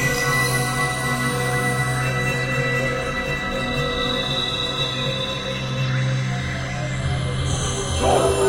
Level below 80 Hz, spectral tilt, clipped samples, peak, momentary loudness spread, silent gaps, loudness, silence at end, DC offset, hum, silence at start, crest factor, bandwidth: -36 dBFS; -4 dB/octave; under 0.1%; -6 dBFS; 5 LU; none; -22 LUFS; 0 s; under 0.1%; none; 0 s; 16 dB; 16.5 kHz